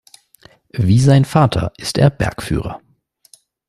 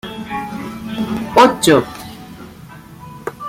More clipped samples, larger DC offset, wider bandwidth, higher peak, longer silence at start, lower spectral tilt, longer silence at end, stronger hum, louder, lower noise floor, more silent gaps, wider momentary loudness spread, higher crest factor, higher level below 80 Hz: neither; neither; second, 13 kHz vs 16.5 kHz; about the same, -2 dBFS vs 0 dBFS; first, 0.75 s vs 0.05 s; first, -6.5 dB/octave vs -4.5 dB/octave; first, 0.9 s vs 0 s; neither; about the same, -15 LUFS vs -16 LUFS; first, -51 dBFS vs -37 dBFS; neither; second, 16 LU vs 25 LU; about the same, 16 dB vs 18 dB; first, -38 dBFS vs -48 dBFS